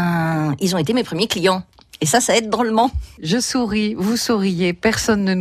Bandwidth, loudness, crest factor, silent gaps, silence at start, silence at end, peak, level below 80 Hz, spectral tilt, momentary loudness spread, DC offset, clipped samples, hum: 15 kHz; -18 LUFS; 16 dB; none; 0 s; 0 s; -2 dBFS; -40 dBFS; -4.5 dB/octave; 3 LU; under 0.1%; under 0.1%; none